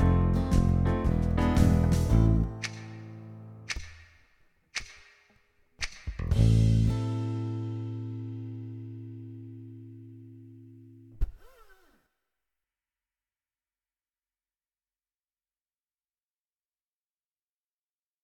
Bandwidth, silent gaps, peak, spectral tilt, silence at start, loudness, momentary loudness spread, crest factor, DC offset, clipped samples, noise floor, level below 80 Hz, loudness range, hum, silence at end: 13.5 kHz; none; -10 dBFS; -7 dB/octave; 0 s; -28 LUFS; 23 LU; 20 dB; under 0.1%; under 0.1%; under -90 dBFS; -36 dBFS; 20 LU; none; 6.75 s